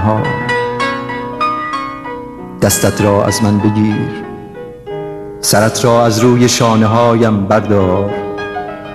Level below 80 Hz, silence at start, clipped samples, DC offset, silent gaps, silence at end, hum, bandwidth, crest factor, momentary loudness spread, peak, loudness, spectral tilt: -42 dBFS; 0 s; under 0.1%; 0.2%; none; 0 s; none; 13.5 kHz; 12 dB; 16 LU; 0 dBFS; -13 LUFS; -5 dB/octave